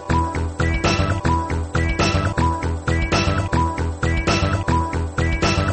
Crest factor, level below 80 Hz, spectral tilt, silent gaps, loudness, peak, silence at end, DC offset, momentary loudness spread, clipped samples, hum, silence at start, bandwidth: 14 dB; -28 dBFS; -5.5 dB/octave; none; -20 LUFS; -6 dBFS; 0 s; under 0.1%; 4 LU; under 0.1%; none; 0 s; 8.8 kHz